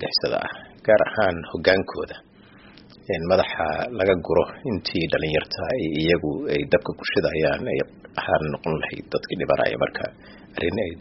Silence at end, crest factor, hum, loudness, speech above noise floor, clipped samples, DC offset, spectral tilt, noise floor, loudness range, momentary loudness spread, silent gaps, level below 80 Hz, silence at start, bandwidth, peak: 0 s; 22 dB; none; -23 LUFS; 25 dB; under 0.1%; under 0.1%; -3.5 dB/octave; -49 dBFS; 2 LU; 10 LU; none; -48 dBFS; 0 s; 6 kHz; -2 dBFS